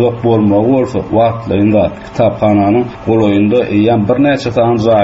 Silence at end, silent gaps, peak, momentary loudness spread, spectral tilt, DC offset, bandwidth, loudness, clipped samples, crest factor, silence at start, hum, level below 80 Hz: 0 s; none; 0 dBFS; 4 LU; -8.5 dB/octave; under 0.1%; 8 kHz; -11 LUFS; under 0.1%; 10 dB; 0 s; none; -40 dBFS